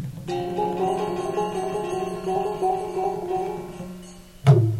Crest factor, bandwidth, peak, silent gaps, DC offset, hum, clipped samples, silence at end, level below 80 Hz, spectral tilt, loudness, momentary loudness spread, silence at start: 22 dB; 13.5 kHz; -4 dBFS; none; under 0.1%; none; under 0.1%; 0 s; -50 dBFS; -7.5 dB/octave; -25 LUFS; 12 LU; 0 s